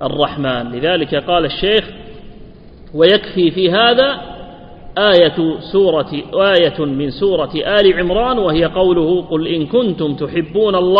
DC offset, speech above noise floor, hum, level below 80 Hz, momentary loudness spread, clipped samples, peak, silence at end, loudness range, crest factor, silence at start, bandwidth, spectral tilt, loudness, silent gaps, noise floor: under 0.1%; 23 dB; none; -38 dBFS; 8 LU; under 0.1%; 0 dBFS; 0 s; 2 LU; 14 dB; 0 s; 5.4 kHz; -8 dB/octave; -14 LUFS; none; -37 dBFS